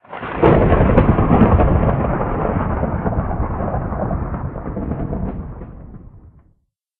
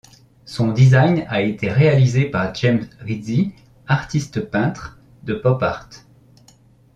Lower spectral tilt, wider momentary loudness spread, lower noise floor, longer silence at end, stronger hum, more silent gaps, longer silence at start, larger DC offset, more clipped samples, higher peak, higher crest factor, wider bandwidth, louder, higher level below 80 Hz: about the same, -8.5 dB/octave vs -7.5 dB/octave; about the same, 14 LU vs 14 LU; first, -62 dBFS vs -51 dBFS; second, 0.8 s vs 1 s; neither; neither; second, 0.1 s vs 0.45 s; neither; neither; about the same, 0 dBFS vs -2 dBFS; about the same, 18 dB vs 18 dB; second, 4 kHz vs 7.8 kHz; about the same, -18 LUFS vs -18 LUFS; first, -24 dBFS vs -48 dBFS